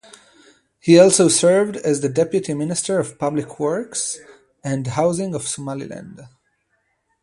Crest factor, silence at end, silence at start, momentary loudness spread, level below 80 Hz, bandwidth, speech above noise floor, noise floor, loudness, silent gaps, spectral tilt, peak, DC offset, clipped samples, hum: 20 dB; 0.95 s; 0.85 s; 16 LU; -60 dBFS; 11.5 kHz; 50 dB; -68 dBFS; -18 LUFS; none; -4.5 dB/octave; 0 dBFS; under 0.1%; under 0.1%; none